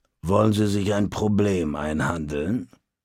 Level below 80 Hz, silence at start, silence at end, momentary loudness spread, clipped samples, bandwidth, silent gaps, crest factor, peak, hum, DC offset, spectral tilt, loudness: -44 dBFS; 0.25 s; 0.4 s; 7 LU; under 0.1%; 15.5 kHz; none; 18 dB; -6 dBFS; none; under 0.1%; -6.5 dB/octave; -23 LUFS